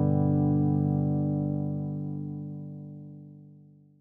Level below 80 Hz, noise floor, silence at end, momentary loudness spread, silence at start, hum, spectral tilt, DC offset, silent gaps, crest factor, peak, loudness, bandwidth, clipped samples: -76 dBFS; -54 dBFS; 0.4 s; 20 LU; 0 s; 50 Hz at -70 dBFS; -14 dB/octave; under 0.1%; none; 14 dB; -14 dBFS; -28 LUFS; 1.7 kHz; under 0.1%